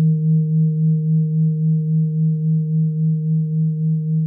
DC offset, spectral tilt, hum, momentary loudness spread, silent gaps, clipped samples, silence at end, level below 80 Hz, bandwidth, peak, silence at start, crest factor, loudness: under 0.1%; -17 dB/octave; none; 2 LU; none; under 0.1%; 0 s; -64 dBFS; 0.5 kHz; -10 dBFS; 0 s; 6 dB; -18 LUFS